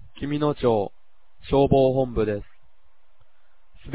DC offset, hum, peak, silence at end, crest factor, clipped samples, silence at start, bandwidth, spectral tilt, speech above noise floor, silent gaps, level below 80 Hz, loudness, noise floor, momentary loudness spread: 0.9%; none; -4 dBFS; 0 s; 20 dB; under 0.1%; 0.2 s; 4 kHz; -11.5 dB/octave; 42 dB; none; -42 dBFS; -23 LUFS; -64 dBFS; 14 LU